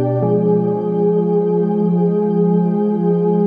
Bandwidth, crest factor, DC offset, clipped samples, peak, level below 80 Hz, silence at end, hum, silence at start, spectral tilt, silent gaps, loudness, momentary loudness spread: 3.3 kHz; 10 dB; under 0.1%; under 0.1%; -4 dBFS; -64 dBFS; 0 s; none; 0 s; -13 dB/octave; none; -16 LUFS; 2 LU